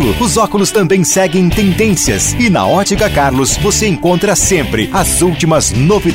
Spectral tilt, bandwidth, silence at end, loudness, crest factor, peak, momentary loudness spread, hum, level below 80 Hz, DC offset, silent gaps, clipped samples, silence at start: -4 dB/octave; 16.5 kHz; 0 s; -11 LUFS; 10 dB; 0 dBFS; 2 LU; none; -26 dBFS; under 0.1%; none; under 0.1%; 0 s